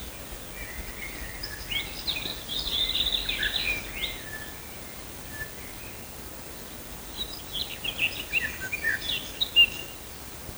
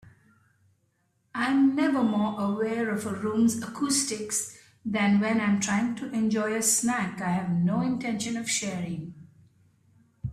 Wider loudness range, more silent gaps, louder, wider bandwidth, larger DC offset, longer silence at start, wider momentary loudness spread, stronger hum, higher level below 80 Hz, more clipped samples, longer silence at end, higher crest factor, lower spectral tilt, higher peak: first, 9 LU vs 2 LU; neither; about the same, -28 LUFS vs -26 LUFS; first, over 20 kHz vs 15 kHz; neither; about the same, 0 s vs 0.05 s; first, 12 LU vs 9 LU; neither; first, -46 dBFS vs -64 dBFS; neither; about the same, 0 s vs 0 s; first, 22 dB vs 16 dB; second, -1.5 dB/octave vs -4 dB/octave; first, -8 dBFS vs -12 dBFS